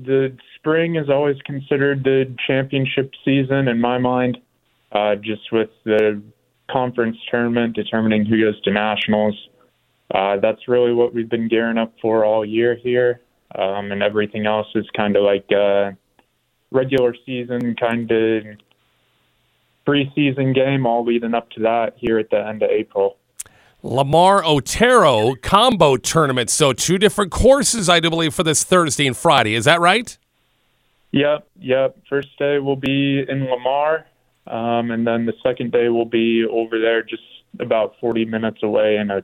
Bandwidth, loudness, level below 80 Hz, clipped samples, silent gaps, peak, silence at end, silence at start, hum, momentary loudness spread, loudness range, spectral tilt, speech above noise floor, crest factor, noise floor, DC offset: 16 kHz; -18 LUFS; -44 dBFS; under 0.1%; none; 0 dBFS; 0 s; 0 s; none; 9 LU; 6 LU; -4.5 dB/octave; 49 dB; 18 dB; -66 dBFS; under 0.1%